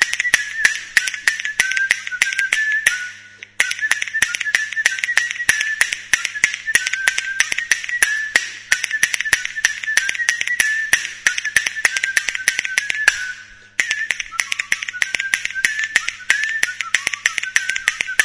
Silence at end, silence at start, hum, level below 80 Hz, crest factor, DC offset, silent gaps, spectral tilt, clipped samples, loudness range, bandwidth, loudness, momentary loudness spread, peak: 0 s; 0 s; none; -56 dBFS; 20 dB; under 0.1%; none; 2 dB/octave; under 0.1%; 2 LU; 11 kHz; -18 LUFS; 4 LU; 0 dBFS